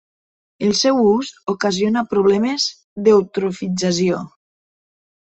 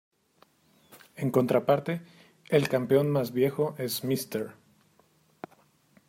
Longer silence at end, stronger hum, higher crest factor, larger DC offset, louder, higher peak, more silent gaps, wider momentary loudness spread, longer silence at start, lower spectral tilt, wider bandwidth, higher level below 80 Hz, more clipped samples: second, 1.1 s vs 1.55 s; neither; about the same, 16 dB vs 20 dB; neither; first, -18 LUFS vs -27 LUFS; first, -2 dBFS vs -10 dBFS; first, 2.84-2.96 s vs none; second, 8 LU vs 23 LU; second, 0.6 s vs 0.95 s; second, -4.5 dB/octave vs -6 dB/octave; second, 8.4 kHz vs 16 kHz; first, -58 dBFS vs -70 dBFS; neither